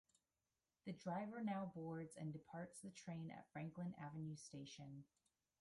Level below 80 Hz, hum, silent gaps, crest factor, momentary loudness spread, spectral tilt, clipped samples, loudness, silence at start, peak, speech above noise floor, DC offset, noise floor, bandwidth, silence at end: -84 dBFS; none; none; 18 dB; 9 LU; -6.5 dB/octave; under 0.1%; -52 LUFS; 0.85 s; -34 dBFS; over 39 dB; under 0.1%; under -90 dBFS; 11.5 kHz; 0.55 s